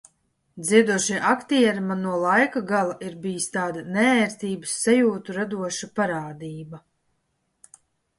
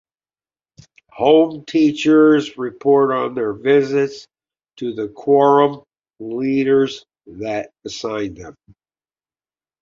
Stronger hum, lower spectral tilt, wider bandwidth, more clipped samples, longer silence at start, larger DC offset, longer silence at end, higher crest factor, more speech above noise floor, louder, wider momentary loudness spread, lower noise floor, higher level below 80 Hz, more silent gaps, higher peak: neither; second, -4 dB/octave vs -6 dB/octave; first, 12 kHz vs 7.6 kHz; neither; second, 0.55 s vs 1.15 s; neither; about the same, 1.4 s vs 1.3 s; about the same, 20 dB vs 16 dB; second, 50 dB vs over 73 dB; second, -23 LUFS vs -17 LUFS; second, 12 LU vs 16 LU; second, -73 dBFS vs under -90 dBFS; second, -66 dBFS vs -58 dBFS; neither; about the same, -4 dBFS vs -2 dBFS